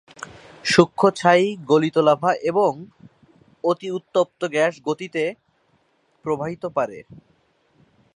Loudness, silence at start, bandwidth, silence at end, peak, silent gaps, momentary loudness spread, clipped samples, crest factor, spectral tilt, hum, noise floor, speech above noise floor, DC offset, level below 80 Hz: -21 LUFS; 0.65 s; 11.5 kHz; 1.15 s; 0 dBFS; none; 13 LU; under 0.1%; 22 dB; -5.5 dB/octave; none; -64 dBFS; 44 dB; under 0.1%; -64 dBFS